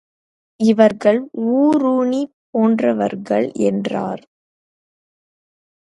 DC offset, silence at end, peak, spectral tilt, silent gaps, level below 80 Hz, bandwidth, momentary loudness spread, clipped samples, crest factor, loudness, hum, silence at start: under 0.1%; 1.65 s; 0 dBFS; -7 dB/octave; 2.33-2.53 s; -66 dBFS; 11 kHz; 10 LU; under 0.1%; 18 dB; -17 LUFS; none; 0.6 s